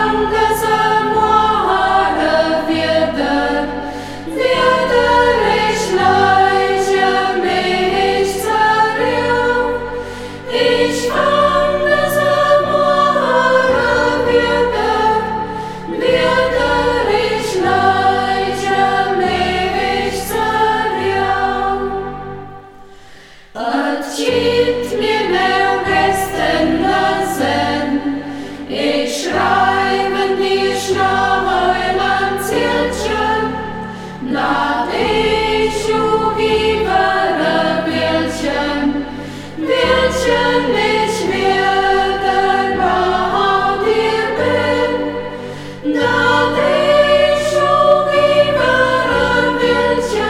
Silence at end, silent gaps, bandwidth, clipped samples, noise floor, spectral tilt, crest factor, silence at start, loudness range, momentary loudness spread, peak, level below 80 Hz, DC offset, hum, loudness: 0 s; none; 16.5 kHz; under 0.1%; -40 dBFS; -4.5 dB/octave; 14 dB; 0 s; 4 LU; 8 LU; 0 dBFS; -38 dBFS; 0.7%; none; -14 LUFS